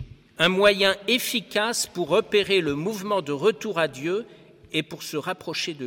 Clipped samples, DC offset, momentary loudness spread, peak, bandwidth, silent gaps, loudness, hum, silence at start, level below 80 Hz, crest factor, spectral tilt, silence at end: under 0.1%; under 0.1%; 11 LU; -6 dBFS; 17.5 kHz; none; -24 LUFS; none; 0 s; -58 dBFS; 20 dB; -3.5 dB/octave; 0 s